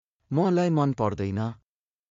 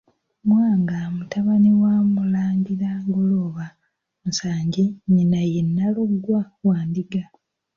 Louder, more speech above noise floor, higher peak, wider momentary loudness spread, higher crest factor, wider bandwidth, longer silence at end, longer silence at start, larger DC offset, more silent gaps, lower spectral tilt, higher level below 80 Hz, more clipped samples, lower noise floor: second, -26 LUFS vs -21 LUFS; first, 56 dB vs 52 dB; second, -12 dBFS vs -8 dBFS; about the same, 8 LU vs 10 LU; about the same, 16 dB vs 12 dB; about the same, 7.4 kHz vs 7.2 kHz; about the same, 0.55 s vs 0.5 s; second, 0.3 s vs 0.45 s; neither; neither; about the same, -8 dB/octave vs -7.5 dB/octave; about the same, -62 dBFS vs -58 dBFS; neither; first, -80 dBFS vs -72 dBFS